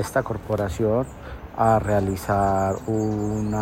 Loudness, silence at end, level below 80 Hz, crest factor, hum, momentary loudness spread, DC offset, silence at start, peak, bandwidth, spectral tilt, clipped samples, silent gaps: -23 LUFS; 0 s; -40 dBFS; 16 dB; none; 7 LU; under 0.1%; 0 s; -6 dBFS; 16 kHz; -7 dB/octave; under 0.1%; none